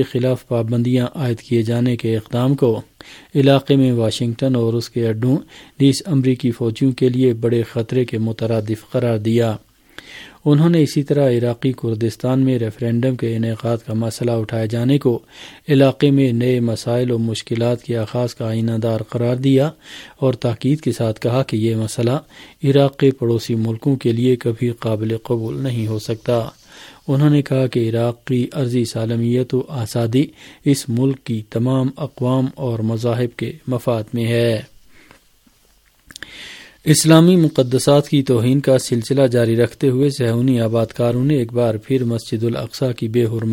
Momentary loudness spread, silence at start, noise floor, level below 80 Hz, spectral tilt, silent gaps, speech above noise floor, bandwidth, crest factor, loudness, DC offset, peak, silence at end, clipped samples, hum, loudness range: 8 LU; 0 s; -55 dBFS; -54 dBFS; -7 dB/octave; none; 38 dB; 17 kHz; 18 dB; -18 LUFS; under 0.1%; 0 dBFS; 0 s; under 0.1%; none; 4 LU